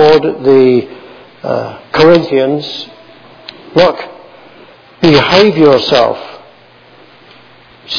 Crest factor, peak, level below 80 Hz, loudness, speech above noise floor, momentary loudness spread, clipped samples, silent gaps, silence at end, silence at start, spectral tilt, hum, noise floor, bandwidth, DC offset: 12 dB; 0 dBFS; -46 dBFS; -9 LUFS; 32 dB; 22 LU; 1%; none; 0 s; 0 s; -6 dB/octave; none; -41 dBFS; 5.4 kHz; under 0.1%